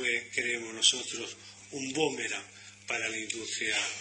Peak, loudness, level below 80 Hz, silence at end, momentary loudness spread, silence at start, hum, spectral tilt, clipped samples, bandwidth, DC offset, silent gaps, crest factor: -8 dBFS; -31 LUFS; -74 dBFS; 0 s; 17 LU; 0 s; none; -0.5 dB/octave; under 0.1%; 10.5 kHz; under 0.1%; none; 26 dB